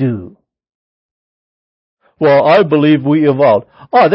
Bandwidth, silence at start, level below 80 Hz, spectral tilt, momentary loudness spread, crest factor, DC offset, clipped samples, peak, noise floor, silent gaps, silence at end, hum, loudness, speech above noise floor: 5.8 kHz; 0 s; -54 dBFS; -9.5 dB/octave; 7 LU; 12 dB; under 0.1%; under 0.1%; 0 dBFS; under -90 dBFS; 0.75-1.97 s; 0 s; none; -11 LUFS; over 80 dB